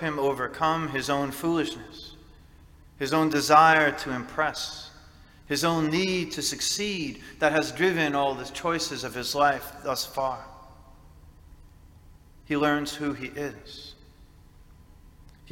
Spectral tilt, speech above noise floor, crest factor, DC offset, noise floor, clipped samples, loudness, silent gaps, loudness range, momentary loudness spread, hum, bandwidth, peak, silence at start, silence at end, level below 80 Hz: -3.5 dB/octave; 26 dB; 24 dB; under 0.1%; -52 dBFS; under 0.1%; -26 LUFS; none; 8 LU; 16 LU; none; 17 kHz; -4 dBFS; 0 s; 0 s; -54 dBFS